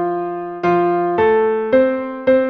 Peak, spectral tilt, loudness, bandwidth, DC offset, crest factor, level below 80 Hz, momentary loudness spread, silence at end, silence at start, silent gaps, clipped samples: -2 dBFS; -8.5 dB/octave; -17 LUFS; 6 kHz; under 0.1%; 14 dB; -52 dBFS; 7 LU; 0 s; 0 s; none; under 0.1%